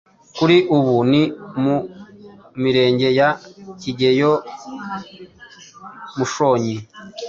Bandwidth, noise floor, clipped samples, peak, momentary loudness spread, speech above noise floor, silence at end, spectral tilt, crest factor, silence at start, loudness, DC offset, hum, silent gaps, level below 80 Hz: 7.6 kHz; -43 dBFS; under 0.1%; -2 dBFS; 21 LU; 25 dB; 0 s; -6 dB/octave; 16 dB; 0.35 s; -18 LUFS; under 0.1%; none; none; -58 dBFS